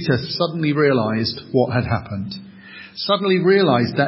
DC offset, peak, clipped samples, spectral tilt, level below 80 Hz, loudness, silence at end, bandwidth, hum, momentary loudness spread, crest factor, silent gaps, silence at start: under 0.1%; -2 dBFS; under 0.1%; -10 dB/octave; -46 dBFS; -19 LUFS; 0 s; 5.8 kHz; none; 18 LU; 16 dB; none; 0 s